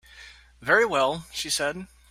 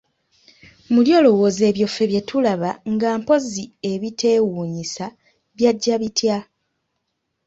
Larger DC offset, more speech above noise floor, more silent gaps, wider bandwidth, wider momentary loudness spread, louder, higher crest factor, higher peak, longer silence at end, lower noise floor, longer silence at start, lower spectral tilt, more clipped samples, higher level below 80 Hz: neither; second, 24 dB vs 56 dB; neither; first, 16 kHz vs 8 kHz; about the same, 13 LU vs 13 LU; second, -24 LUFS vs -19 LUFS; about the same, 20 dB vs 18 dB; second, -6 dBFS vs -2 dBFS; second, 0.25 s vs 1.05 s; second, -49 dBFS vs -75 dBFS; second, 0.15 s vs 0.9 s; second, -2 dB/octave vs -5 dB/octave; neither; about the same, -56 dBFS vs -60 dBFS